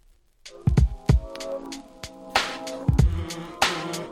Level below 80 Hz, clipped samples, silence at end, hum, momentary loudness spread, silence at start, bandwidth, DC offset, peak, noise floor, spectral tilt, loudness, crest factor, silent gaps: -30 dBFS; under 0.1%; 0 s; none; 16 LU; 0.45 s; 15.5 kHz; under 0.1%; -6 dBFS; -51 dBFS; -5 dB/octave; -25 LUFS; 20 dB; none